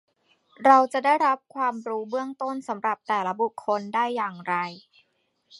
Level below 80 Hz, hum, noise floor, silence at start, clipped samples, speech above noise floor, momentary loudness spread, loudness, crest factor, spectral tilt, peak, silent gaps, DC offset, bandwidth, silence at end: -82 dBFS; none; -71 dBFS; 0.6 s; under 0.1%; 46 dB; 12 LU; -25 LUFS; 22 dB; -5 dB/octave; -2 dBFS; none; under 0.1%; 11.5 kHz; 0.8 s